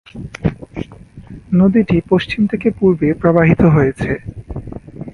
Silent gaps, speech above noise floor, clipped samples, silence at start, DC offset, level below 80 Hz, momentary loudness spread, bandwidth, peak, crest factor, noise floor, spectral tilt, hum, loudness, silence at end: none; 24 dB; under 0.1%; 0.15 s; under 0.1%; -36 dBFS; 18 LU; 10.5 kHz; 0 dBFS; 16 dB; -37 dBFS; -9 dB/octave; none; -14 LUFS; 0.05 s